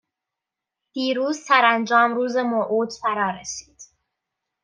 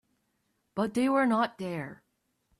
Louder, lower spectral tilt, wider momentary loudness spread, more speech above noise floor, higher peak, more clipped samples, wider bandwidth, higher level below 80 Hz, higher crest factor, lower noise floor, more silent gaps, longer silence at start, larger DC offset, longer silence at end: first, -20 LUFS vs -29 LUFS; second, -3 dB/octave vs -6 dB/octave; about the same, 15 LU vs 14 LU; first, 65 dB vs 49 dB; first, -2 dBFS vs -16 dBFS; neither; second, 10 kHz vs 13 kHz; about the same, -68 dBFS vs -72 dBFS; about the same, 20 dB vs 16 dB; first, -86 dBFS vs -77 dBFS; neither; first, 0.95 s vs 0.75 s; neither; first, 0.8 s vs 0.65 s